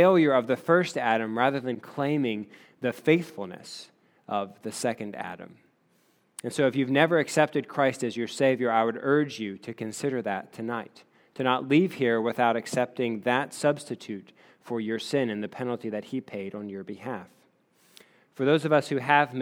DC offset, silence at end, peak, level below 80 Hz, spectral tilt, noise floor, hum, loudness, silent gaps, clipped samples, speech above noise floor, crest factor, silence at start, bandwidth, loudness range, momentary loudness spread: under 0.1%; 0 s; -4 dBFS; -80 dBFS; -5.5 dB/octave; -67 dBFS; none; -27 LUFS; none; under 0.1%; 40 dB; 22 dB; 0 s; 20 kHz; 7 LU; 15 LU